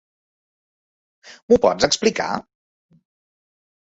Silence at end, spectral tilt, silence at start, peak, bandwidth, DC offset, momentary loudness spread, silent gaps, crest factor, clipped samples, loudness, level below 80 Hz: 1.55 s; -3 dB/octave; 1.25 s; -2 dBFS; 8 kHz; under 0.1%; 10 LU; 1.43-1.48 s; 22 dB; under 0.1%; -19 LUFS; -54 dBFS